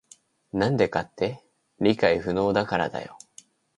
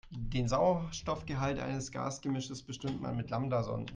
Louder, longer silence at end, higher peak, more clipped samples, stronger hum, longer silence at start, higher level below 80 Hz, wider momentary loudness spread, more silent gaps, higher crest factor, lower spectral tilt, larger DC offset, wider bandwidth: first, -25 LUFS vs -35 LUFS; first, 0.6 s vs 0 s; first, -6 dBFS vs -18 dBFS; neither; neither; first, 0.55 s vs 0.05 s; about the same, -54 dBFS vs -50 dBFS; first, 12 LU vs 9 LU; neither; about the same, 20 dB vs 16 dB; about the same, -6.5 dB/octave vs -6 dB/octave; neither; first, 11.5 kHz vs 9.8 kHz